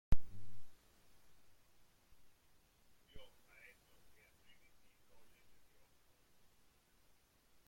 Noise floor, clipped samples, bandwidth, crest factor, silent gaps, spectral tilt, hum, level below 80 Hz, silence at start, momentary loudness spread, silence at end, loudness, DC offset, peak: -72 dBFS; under 0.1%; 16 kHz; 24 dB; none; -6 dB/octave; none; -52 dBFS; 0.1 s; 23 LU; 4.4 s; -53 LUFS; under 0.1%; -18 dBFS